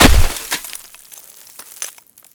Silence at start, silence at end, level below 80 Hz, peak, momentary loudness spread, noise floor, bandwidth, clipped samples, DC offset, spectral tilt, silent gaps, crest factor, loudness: 0 s; 0.45 s; -20 dBFS; 0 dBFS; 20 LU; -41 dBFS; over 20 kHz; under 0.1%; under 0.1%; -3.5 dB/octave; none; 16 dB; -19 LUFS